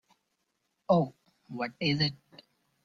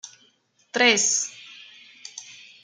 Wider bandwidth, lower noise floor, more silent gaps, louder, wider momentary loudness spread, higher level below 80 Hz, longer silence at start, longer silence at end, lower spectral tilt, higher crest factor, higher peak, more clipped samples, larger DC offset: second, 7.4 kHz vs 10.5 kHz; first, -79 dBFS vs -63 dBFS; neither; second, -30 LUFS vs -20 LUFS; second, 15 LU vs 26 LU; first, -66 dBFS vs -80 dBFS; first, 0.9 s vs 0.05 s; first, 0.7 s vs 0.3 s; first, -7 dB/octave vs 0 dB/octave; about the same, 22 dB vs 22 dB; second, -12 dBFS vs -4 dBFS; neither; neither